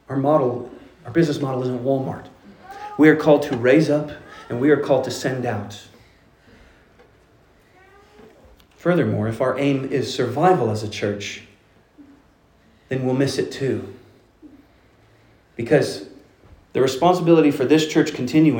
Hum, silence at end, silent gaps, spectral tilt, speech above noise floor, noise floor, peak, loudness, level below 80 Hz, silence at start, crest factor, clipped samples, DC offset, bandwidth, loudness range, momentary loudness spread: none; 0 s; none; -6.5 dB/octave; 37 dB; -55 dBFS; -2 dBFS; -20 LUFS; -58 dBFS; 0.1 s; 20 dB; under 0.1%; under 0.1%; 17 kHz; 8 LU; 17 LU